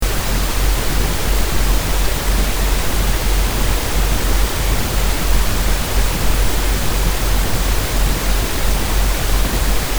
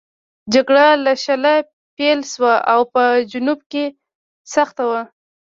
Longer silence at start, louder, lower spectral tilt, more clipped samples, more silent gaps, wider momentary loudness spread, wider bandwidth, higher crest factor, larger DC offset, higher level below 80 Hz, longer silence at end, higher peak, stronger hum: second, 0 s vs 0.45 s; about the same, -18 LUFS vs -16 LUFS; about the same, -3.5 dB/octave vs -3 dB/octave; neither; second, none vs 1.73-1.97 s, 3.66-3.70 s, 4.15-4.45 s; second, 1 LU vs 12 LU; first, over 20 kHz vs 7.6 kHz; about the same, 12 dB vs 16 dB; neither; first, -18 dBFS vs -64 dBFS; second, 0 s vs 0.4 s; about the same, -2 dBFS vs -2 dBFS; neither